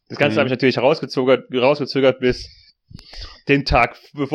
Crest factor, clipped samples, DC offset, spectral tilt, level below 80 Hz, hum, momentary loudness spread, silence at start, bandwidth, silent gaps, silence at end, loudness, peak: 18 dB; under 0.1%; under 0.1%; -6.5 dB/octave; -36 dBFS; none; 14 LU; 0.1 s; 9.8 kHz; none; 0 s; -18 LUFS; -2 dBFS